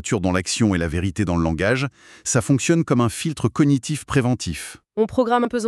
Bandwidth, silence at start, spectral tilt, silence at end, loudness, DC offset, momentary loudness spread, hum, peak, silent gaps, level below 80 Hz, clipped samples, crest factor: 13 kHz; 0 s; -5.5 dB/octave; 0 s; -21 LUFS; under 0.1%; 7 LU; none; -4 dBFS; none; -42 dBFS; under 0.1%; 16 dB